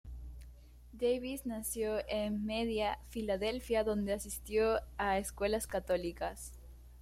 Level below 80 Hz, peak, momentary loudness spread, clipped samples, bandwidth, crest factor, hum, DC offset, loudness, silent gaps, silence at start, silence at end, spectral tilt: -52 dBFS; -20 dBFS; 14 LU; under 0.1%; 16 kHz; 16 dB; 60 Hz at -50 dBFS; under 0.1%; -36 LUFS; none; 0.05 s; 0 s; -4.5 dB/octave